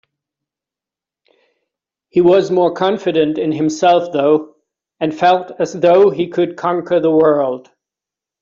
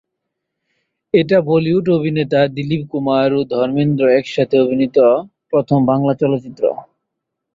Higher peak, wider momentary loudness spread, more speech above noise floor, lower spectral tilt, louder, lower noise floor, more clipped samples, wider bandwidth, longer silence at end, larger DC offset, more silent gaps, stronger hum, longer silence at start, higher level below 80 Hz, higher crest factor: about the same, -2 dBFS vs -2 dBFS; about the same, 8 LU vs 6 LU; first, 74 dB vs 63 dB; second, -6 dB/octave vs -8.5 dB/octave; about the same, -14 LUFS vs -16 LUFS; first, -88 dBFS vs -77 dBFS; neither; about the same, 7.6 kHz vs 7.4 kHz; about the same, 0.8 s vs 0.7 s; neither; neither; neither; first, 2.15 s vs 1.15 s; about the same, -60 dBFS vs -56 dBFS; about the same, 14 dB vs 14 dB